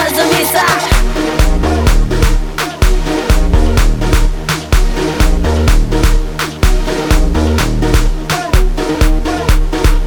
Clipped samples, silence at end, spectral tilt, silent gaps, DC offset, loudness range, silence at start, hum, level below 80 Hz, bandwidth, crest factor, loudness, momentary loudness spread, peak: under 0.1%; 0 s; -5 dB/octave; none; under 0.1%; 1 LU; 0 s; none; -12 dBFS; 20 kHz; 10 dB; -13 LUFS; 5 LU; 0 dBFS